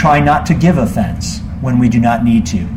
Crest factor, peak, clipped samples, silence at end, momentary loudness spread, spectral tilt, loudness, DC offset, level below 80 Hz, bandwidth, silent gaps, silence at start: 12 dB; 0 dBFS; under 0.1%; 0 s; 9 LU; -6.5 dB/octave; -13 LUFS; under 0.1%; -28 dBFS; 15 kHz; none; 0 s